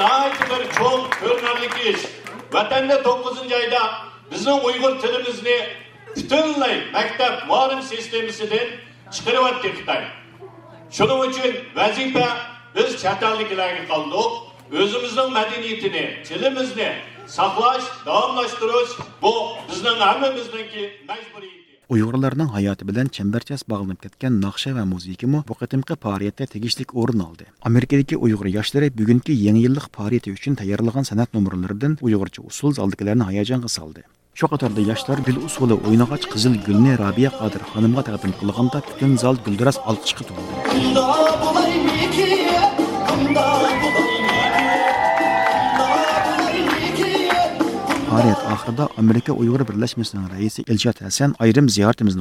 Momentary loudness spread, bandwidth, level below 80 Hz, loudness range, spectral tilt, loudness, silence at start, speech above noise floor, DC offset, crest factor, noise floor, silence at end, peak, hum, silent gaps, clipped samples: 9 LU; 15.5 kHz; -52 dBFS; 5 LU; -5.5 dB/octave; -20 LUFS; 0 s; 22 dB; under 0.1%; 18 dB; -42 dBFS; 0 s; -2 dBFS; none; none; under 0.1%